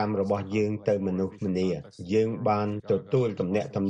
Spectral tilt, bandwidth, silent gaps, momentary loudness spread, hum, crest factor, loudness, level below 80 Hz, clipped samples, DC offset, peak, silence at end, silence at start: -8 dB/octave; 8.8 kHz; none; 4 LU; none; 16 dB; -27 LUFS; -62 dBFS; under 0.1%; under 0.1%; -12 dBFS; 0 s; 0 s